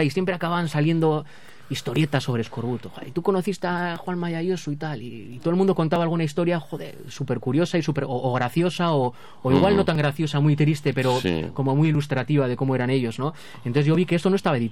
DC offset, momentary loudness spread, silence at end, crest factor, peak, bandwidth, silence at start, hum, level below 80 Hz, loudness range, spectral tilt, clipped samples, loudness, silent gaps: 0.8%; 10 LU; 0 s; 18 dB; -4 dBFS; 14 kHz; 0 s; none; -54 dBFS; 4 LU; -7 dB/octave; under 0.1%; -23 LUFS; none